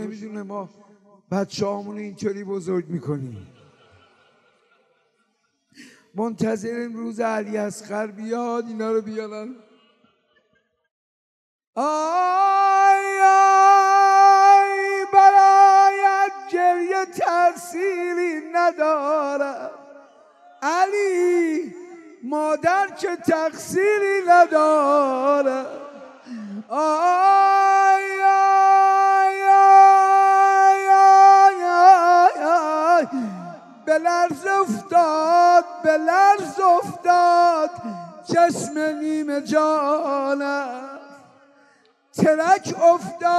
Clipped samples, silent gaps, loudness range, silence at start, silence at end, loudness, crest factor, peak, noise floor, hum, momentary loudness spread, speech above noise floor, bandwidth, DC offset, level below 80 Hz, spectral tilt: under 0.1%; 10.91-11.59 s, 11.67-11.73 s; 16 LU; 0 s; 0 s; -17 LUFS; 16 dB; -2 dBFS; -70 dBFS; none; 18 LU; 50 dB; 12.5 kHz; under 0.1%; -76 dBFS; -4.5 dB/octave